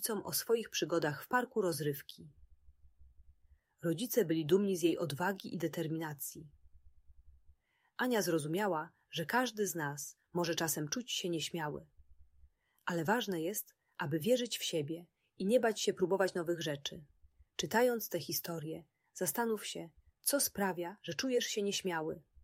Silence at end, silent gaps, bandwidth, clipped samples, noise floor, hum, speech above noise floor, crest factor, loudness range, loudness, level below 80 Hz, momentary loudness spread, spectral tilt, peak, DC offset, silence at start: 0.25 s; none; 16 kHz; under 0.1%; -69 dBFS; none; 33 dB; 20 dB; 4 LU; -36 LUFS; -70 dBFS; 12 LU; -4 dB/octave; -18 dBFS; under 0.1%; 0 s